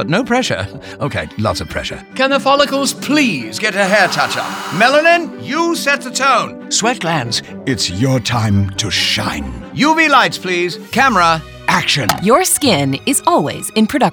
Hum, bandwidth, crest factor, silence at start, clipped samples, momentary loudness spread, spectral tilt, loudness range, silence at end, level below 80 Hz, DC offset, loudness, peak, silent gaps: none; over 20 kHz; 14 dB; 0 s; under 0.1%; 10 LU; -3.5 dB/octave; 3 LU; 0 s; -42 dBFS; under 0.1%; -14 LUFS; 0 dBFS; none